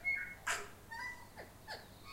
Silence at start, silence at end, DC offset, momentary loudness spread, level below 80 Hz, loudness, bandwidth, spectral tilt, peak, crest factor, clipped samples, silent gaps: 0 s; 0 s; under 0.1%; 14 LU; -64 dBFS; -43 LUFS; 16 kHz; -1.5 dB/octave; -22 dBFS; 22 dB; under 0.1%; none